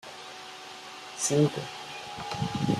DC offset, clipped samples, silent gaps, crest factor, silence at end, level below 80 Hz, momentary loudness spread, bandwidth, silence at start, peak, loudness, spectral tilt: under 0.1%; under 0.1%; none; 20 dB; 0 s; -62 dBFS; 17 LU; 14 kHz; 0.05 s; -10 dBFS; -30 LUFS; -4.5 dB/octave